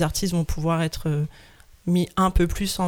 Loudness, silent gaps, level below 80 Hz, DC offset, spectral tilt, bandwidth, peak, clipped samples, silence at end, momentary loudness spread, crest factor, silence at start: -24 LUFS; none; -32 dBFS; under 0.1%; -5.5 dB/octave; 18 kHz; -8 dBFS; under 0.1%; 0 s; 6 LU; 14 dB; 0 s